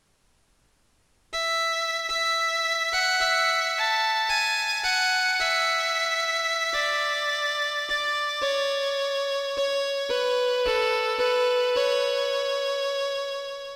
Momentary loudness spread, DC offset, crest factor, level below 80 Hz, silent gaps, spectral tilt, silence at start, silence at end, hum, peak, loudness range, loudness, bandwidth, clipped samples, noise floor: 5 LU; under 0.1%; 14 dB; -58 dBFS; none; 1.5 dB/octave; 1.3 s; 0 s; none; -12 dBFS; 3 LU; -24 LUFS; 17 kHz; under 0.1%; -65 dBFS